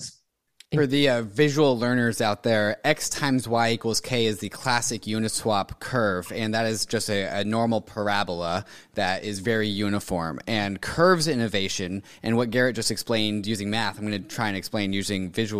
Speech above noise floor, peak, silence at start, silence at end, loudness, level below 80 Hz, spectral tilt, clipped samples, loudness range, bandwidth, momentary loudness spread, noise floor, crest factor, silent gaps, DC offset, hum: 36 dB; -6 dBFS; 0 s; 0 s; -25 LUFS; -54 dBFS; -4.5 dB/octave; under 0.1%; 3 LU; 15.5 kHz; 7 LU; -61 dBFS; 20 dB; none; 0.6%; none